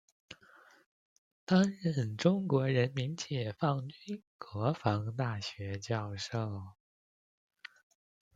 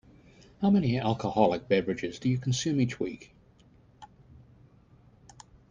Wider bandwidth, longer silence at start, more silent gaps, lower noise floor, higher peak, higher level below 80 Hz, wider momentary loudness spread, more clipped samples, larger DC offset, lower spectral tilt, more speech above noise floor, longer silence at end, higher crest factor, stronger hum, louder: second, 7.8 kHz vs 9.8 kHz; second, 0.3 s vs 0.6 s; first, 0.86-1.47 s, 4.27-4.39 s vs none; about the same, -61 dBFS vs -59 dBFS; about the same, -12 dBFS vs -10 dBFS; second, -72 dBFS vs -60 dBFS; first, 24 LU vs 9 LU; neither; neither; about the same, -6.5 dB/octave vs -6 dB/octave; second, 28 dB vs 32 dB; about the same, 1.65 s vs 1.65 s; about the same, 22 dB vs 22 dB; neither; second, -34 LUFS vs -28 LUFS